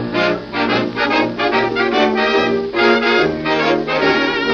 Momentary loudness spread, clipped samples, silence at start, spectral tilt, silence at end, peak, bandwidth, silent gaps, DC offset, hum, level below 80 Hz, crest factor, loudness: 4 LU; under 0.1%; 0 s; -5.5 dB/octave; 0 s; -2 dBFS; 7 kHz; none; under 0.1%; none; -46 dBFS; 14 dB; -15 LUFS